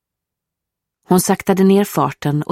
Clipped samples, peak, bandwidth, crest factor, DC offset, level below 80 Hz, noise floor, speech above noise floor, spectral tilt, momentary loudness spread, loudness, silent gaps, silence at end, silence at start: under 0.1%; -2 dBFS; 16 kHz; 16 dB; under 0.1%; -56 dBFS; -82 dBFS; 67 dB; -6 dB/octave; 6 LU; -15 LUFS; none; 0.1 s; 1.1 s